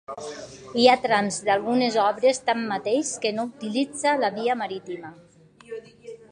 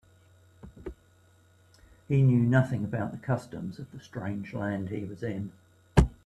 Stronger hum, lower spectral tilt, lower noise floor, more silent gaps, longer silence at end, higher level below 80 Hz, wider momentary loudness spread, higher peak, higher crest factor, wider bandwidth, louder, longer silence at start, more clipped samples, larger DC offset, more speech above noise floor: neither; second, -3.5 dB/octave vs -8 dB/octave; second, -44 dBFS vs -61 dBFS; neither; about the same, 0.15 s vs 0.15 s; second, -68 dBFS vs -40 dBFS; about the same, 20 LU vs 20 LU; about the same, -2 dBFS vs -4 dBFS; about the same, 22 dB vs 26 dB; about the same, 11 kHz vs 10.5 kHz; first, -23 LUFS vs -29 LUFS; second, 0.1 s vs 0.65 s; neither; neither; second, 20 dB vs 33 dB